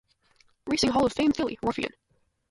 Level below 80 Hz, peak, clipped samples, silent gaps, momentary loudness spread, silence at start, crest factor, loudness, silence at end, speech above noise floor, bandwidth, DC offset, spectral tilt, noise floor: -52 dBFS; -12 dBFS; under 0.1%; none; 11 LU; 0.65 s; 18 dB; -26 LUFS; 0.65 s; 39 dB; 11.5 kHz; under 0.1%; -4.5 dB/octave; -64 dBFS